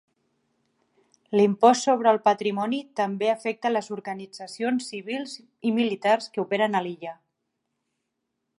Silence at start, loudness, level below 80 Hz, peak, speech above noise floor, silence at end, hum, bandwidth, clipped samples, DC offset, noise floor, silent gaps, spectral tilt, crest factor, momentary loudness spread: 1.3 s; -24 LUFS; -76 dBFS; -4 dBFS; 56 dB; 1.45 s; none; 11.5 kHz; under 0.1%; under 0.1%; -80 dBFS; none; -5 dB/octave; 22 dB; 15 LU